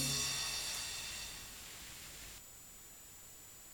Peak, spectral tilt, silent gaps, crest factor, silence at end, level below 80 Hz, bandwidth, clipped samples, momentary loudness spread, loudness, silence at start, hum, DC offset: -24 dBFS; -1 dB/octave; none; 20 dB; 0 s; -62 dBFS; 19 kHz; under 0.1%; 17 LU; -40 LUFS; 0 s; none; under 0.1%